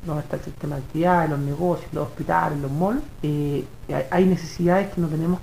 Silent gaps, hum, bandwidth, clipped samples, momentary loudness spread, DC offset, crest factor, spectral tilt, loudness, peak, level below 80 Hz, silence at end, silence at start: none; none; 15.5 kHz; under 0.1%; 10 LU; 0.8%; 18 dB; -8 dB/octave; -24 LUFS; -6 dBFS; -42 dBFS; 0 s; 0 s